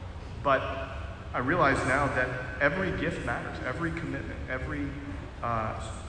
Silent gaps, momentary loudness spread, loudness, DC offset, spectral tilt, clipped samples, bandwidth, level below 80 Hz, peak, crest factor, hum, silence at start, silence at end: none; 11 LU; -30 LUFS; under 0.1%; -6 dB/octave; under 0.1%; 10.5 kHz; -42 dBFS; -12 dBFS; 18 dB; none; 0 s; 0 s